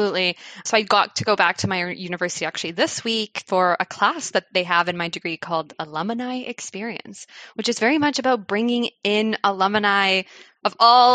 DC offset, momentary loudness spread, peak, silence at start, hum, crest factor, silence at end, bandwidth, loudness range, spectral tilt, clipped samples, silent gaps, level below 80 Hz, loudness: under 0.1%; 12 LU; -4 dBFS; 0 s; none; 18 dB; 0 s; 9.4 kHz; 5 LU; -3 dB/octave; under 0.1%; none; -72 dBFS; -21 LUFS